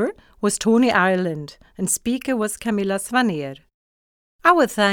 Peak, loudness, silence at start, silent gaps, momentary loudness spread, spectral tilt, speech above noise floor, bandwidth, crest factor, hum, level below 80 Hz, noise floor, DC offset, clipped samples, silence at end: -2 dBFS; -20 LUFS; 0 s; 3.74-4.39 s; 12 LU; -4 dB/octave; over 70 dB; 19.5 kHz; 18 dB; none; -56 dBFS; under -90 dBFS; under 0.1%; under 0.1%; 0 s